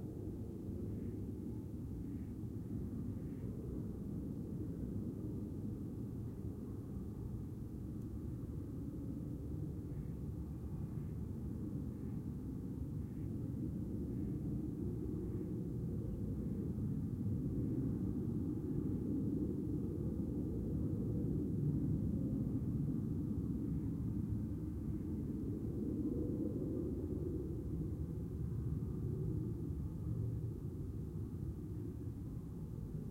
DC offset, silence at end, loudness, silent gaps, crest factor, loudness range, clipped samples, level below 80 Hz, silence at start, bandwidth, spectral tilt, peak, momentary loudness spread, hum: under 0.1%; 0 s; -42 LUFS; none; 16 dB; 6 LU; under 0.1%; -50 dBFS; 0 s; 16 kHz; -10.5 dB/octave; -26 dBFS; 7 LU; none